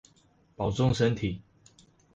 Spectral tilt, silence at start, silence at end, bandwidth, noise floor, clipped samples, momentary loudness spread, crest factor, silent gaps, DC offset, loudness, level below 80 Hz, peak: -6.5 dB/octave; 0.6 s; 0.75 s; 8 kHz; -64 dBFS; under 0.1%; 10 LU; 18 dB; none; under 0.1%; -28 LUFS; -50 dBFS; -12 dBFS